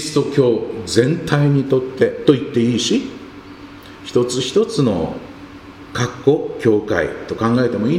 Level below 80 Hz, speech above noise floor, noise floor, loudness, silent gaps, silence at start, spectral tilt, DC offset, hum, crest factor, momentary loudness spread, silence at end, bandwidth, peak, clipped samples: -48 dBFS; 20 dB; -37 dBFS; -17 LUFS; none; 0 s; -6 dB/octave; under 0.1%; none; 18 dB; 21 LU; 0 s; 14 kHz; 0 dBFS; under 0.1%